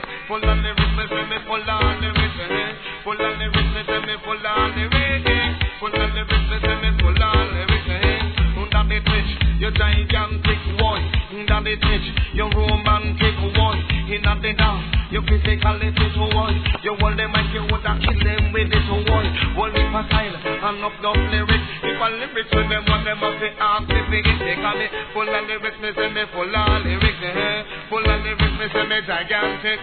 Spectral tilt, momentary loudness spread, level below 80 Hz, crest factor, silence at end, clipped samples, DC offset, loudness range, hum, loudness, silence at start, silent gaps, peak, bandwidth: -8.5 dB/octave; 5 LU; -24 dBFS; 18 dB; 0 s; under 0.1%; 0.3%; 2 LU; none; -20 LUFS; 0 s; none; -2 dBFS; 4.5 kHz